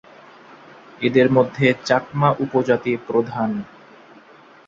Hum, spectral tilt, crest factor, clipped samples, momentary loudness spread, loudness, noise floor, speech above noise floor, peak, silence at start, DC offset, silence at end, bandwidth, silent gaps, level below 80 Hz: none; -7 dB/octave; 20 dB; under 0.1%; 9 LU; -19 LUFS; -47 dBFS; 29 dB; -2 dBFS; 1 s; under 0.1%; 1.05 s; 7.6 kHz; none; -60 dBFS